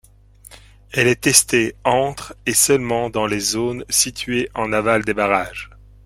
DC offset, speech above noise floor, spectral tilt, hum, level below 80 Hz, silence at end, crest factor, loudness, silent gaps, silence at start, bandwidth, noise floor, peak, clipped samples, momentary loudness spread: under 0.1%; 28 dB; -2.5 dB/octave; none; -46 dBFS; 0.4 s; 20 dB; -18 LUFS; none; 0.5 s; 16.5 kHz; -47 dBFS; 0 dBFS; under 0.1%; 12 LU